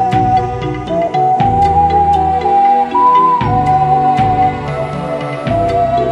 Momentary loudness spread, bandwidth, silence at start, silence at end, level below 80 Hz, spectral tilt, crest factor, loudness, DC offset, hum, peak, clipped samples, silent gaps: 9 LU; 9.6 kHz; 0 s; 0 s; -32 dBFS; -7.5 dB/octave; 10 dB; -12 LUFS; under 0.1%; none; -2 dBFS; under 0.1%; none